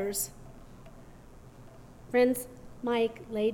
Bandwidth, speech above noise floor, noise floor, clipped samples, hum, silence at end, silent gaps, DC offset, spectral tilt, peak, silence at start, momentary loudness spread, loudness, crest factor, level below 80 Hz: 18 kHz; 22 dB; -51 dBFS; under 0.1%; none; 0 s; none; under 0.1%; -4 dB/octave; -14 dBFS; 0 s; 26 LU; -30 LUFS; 18 dB; -54 dBFS